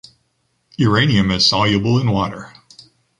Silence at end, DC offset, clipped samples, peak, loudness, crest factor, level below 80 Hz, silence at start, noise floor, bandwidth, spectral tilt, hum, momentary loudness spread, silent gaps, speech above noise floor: 0.7 s; under 0.1%; under 0.1%; -2 dBFS; -16 LUFS; 16 dB; -42 dBFS; 0.8 s; -66 dBFS; 10.5 kHz; -5.5 dB/octave; none; 13 LU; none; 51 dB